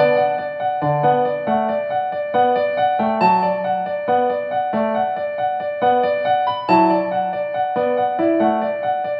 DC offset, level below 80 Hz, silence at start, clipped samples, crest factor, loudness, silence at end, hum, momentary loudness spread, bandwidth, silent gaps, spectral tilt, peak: under 0.1%; -62 dBFS; 0 s; under 0.1%; 16 dB; -19 LUFS; 0 s; none; 6 LU; 5.4 kHz; none; -8.5 dB/octave; -2 dBFS